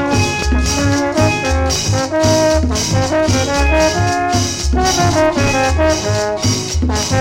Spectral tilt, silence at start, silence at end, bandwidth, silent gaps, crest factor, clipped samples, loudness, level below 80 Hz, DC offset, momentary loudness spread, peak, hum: -4.5 dB/octave; 0 s; 0 s; 16.5 kHz; none; 14 dB; under 0.1%; -14 LUFS; -22 dBFS; under 0.1%; 3 LU; 0 dBFS; none